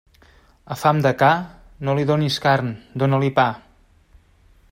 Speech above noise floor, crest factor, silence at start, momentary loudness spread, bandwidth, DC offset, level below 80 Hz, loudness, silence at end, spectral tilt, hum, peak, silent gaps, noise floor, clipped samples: 35 dB; 18 dB; 0.7 s; 12 LU; 16 kHz; under 0.1%; -54 dBFS; -20 LUFS; 1.15 s; -6.5 dB/octave; none; -2 dBFS; none; -54 dBFS; under 0.1%